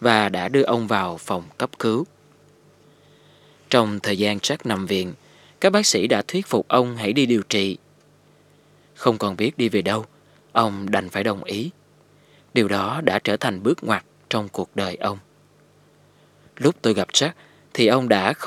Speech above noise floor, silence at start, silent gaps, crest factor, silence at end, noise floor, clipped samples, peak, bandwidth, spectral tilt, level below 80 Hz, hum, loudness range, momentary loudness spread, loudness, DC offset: 34 dB; 0 s; none; 22 dB; 0 s; -55 dBFS; under 0.1%; 0 dBFS; 16 kHz; -4 dB/octave; -70 dBFS; 50 Hz at -50 dBFS; 5 LU; 10 LU; -22 LUFS; under 0.1%